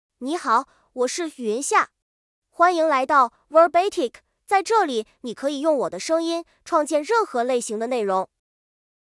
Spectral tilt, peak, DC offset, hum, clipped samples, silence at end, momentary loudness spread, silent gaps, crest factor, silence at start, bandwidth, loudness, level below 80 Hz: -3 dB/octave; -4 dBFS; under 0.1%; none; under 0.1%; 0.85 s; 11 LU; 2.02-2.42 s; 18 dB; 0.2 s; 12 kHz; -22 LUFS; -70 dBFS